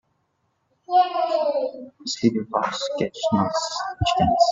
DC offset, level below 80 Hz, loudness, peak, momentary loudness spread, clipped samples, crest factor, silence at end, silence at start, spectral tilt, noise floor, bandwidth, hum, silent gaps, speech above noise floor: under 0.1%; -48 dBFS; -23 LUFS; -6 dBFS; 7 LU; under 0.1%; 18 dB; 0 s; 0.9 s; -5 dB/octave; -71 dBFS; 8 kHz; none; none; 49 dB